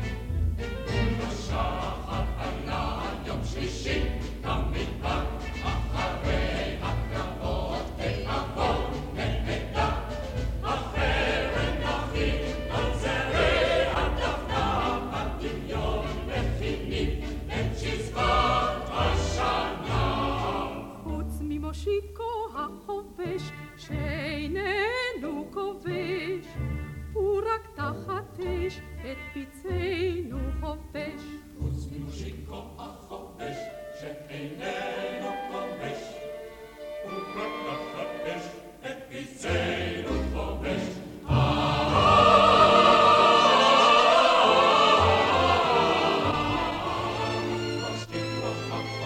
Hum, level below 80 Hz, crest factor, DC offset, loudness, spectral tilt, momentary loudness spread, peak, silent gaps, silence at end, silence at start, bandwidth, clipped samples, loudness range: none; -36 dBFS; 20 dB; under 0.1%; -26 LUFS; -5 dB/octave; 18 LU; -6 dBFS; none; 0 s; 0 s; 16.5 kHz; under 0.1%; 16 LU